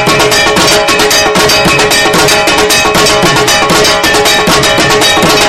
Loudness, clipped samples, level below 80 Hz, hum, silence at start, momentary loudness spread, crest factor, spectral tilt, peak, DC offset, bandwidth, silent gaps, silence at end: -5 LUFS; 1%; -30 dBFS; none; 0 s; 1 LU; 6 dB; -2 dB/octave; 0 dBFS; 0.7%; over 20 kHz; none; 0 s